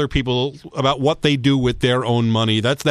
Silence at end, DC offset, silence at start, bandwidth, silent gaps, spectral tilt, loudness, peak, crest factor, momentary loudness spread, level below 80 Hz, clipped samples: 0 s; under 0.1%; 0 s; 13.5 kHz; none; -6 dB/octave; -18 LUFS; -2 dBFS; 16 dB; 4 LU; -38 dBFS; under 0.1%